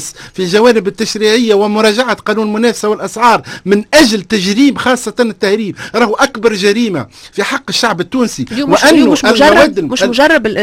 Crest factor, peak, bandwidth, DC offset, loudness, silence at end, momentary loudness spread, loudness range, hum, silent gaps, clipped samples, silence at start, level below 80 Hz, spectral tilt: 10 dB; 0 dBFS; 16.5 kHz; under 0.1%; -10 LUFS; 0 s; 9 LU; 3 LU; none; none; 0.4%; 0 s; -42 dBFS; -4 dB/octave